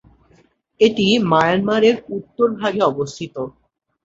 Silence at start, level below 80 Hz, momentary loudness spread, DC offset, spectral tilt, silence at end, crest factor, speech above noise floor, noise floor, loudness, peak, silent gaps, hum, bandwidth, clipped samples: 0.8 s; -56 dBFS; 14 LU; under 0.1%; -5.5 dB/octave; 0.55 s; 18 dB; 39 dB; -56 dBFS; -17 LUFS; -2 dBFS; none; none; 7.8 kHz; under 0.1%